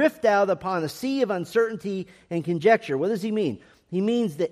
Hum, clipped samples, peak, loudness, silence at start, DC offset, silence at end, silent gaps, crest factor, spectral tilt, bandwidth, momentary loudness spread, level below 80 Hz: none; under 0.1%; -6 dBFS; -25 LUFS; 0 s; under 0.1%; 0.05 s; none; 18 dB; -6.5 dB/octave; 15 kHz; 11 LU; -66 dBFS